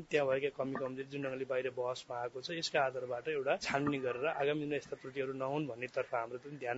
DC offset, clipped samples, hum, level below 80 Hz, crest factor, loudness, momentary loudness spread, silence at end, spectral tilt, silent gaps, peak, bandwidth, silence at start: under 0.1%; under 0.1%; none; -74 dBFS; 20 dB; -37 LUFS; 7 LU; 0 s; -3.5 dB/octave; none; -18 dBFS; 7.6 kHz; 0 s